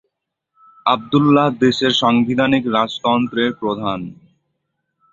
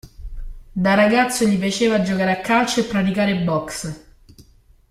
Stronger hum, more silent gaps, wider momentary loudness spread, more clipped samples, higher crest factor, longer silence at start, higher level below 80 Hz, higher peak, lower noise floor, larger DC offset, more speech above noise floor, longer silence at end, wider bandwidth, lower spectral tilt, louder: neither; neither; second, 9 LU vs 18 LU; neither; about the same, 18 dB vs 16 dB; first, 0.85 s vs 0.05 s; second, -54 dBFS vs -40 dBFS; about the same, -2 dBFS vs -4 dBFS; first, -76 dBFS vs -51 dBFS; neither; first, 60 dB vs 32 dB; first, 1 s vs 0.5 s; second, 7.6 kHz vs 15 kHz; about the same, -6 dB/octave vs -5 dB/octave; about the same, -17 LUFS vs -19 LUFS